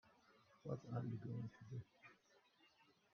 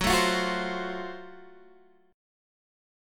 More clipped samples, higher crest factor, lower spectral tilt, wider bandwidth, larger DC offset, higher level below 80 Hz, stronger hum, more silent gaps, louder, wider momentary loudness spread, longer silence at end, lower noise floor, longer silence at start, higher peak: neither; about the same, 20 dB vs 20 dB; first, -8.5 dB/octave vs -3.5 dB/octave; second, 6.6 kHz vs 17.5 kHz; neither; second, -82 dBFS vs -48 dBFS; neither; neither; second, -51 LUFS vs -28 LUFS; second, 17 LU vs 20 LU; second, 0.25 s vs 0.95 s; first, -75 dBFS vs -58 dBFS; about the same, 0.05 s vs 0 s; second, -34 dBFS vs -12 dBFS